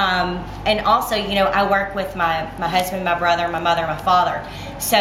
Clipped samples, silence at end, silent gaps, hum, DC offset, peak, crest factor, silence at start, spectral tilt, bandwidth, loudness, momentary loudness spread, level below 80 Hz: under 0.1%; 0 s; none; none; under 0.1%; -2 dBFS; 18 dB; 0 s; -3.5 dB/octave; 16.5 kHz; -19 LUFS; 7 LU; -40 dBFS